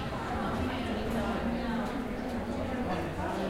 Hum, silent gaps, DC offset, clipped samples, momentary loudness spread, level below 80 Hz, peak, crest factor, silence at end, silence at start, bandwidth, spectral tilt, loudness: none; none; under 0.1%; under 0.1%; 3 LU; -44 dBFS; -20 dBFS; 12 dB; 0 s; 0 s; 16 kHz; -6.5 dB/octave; -33 LUFS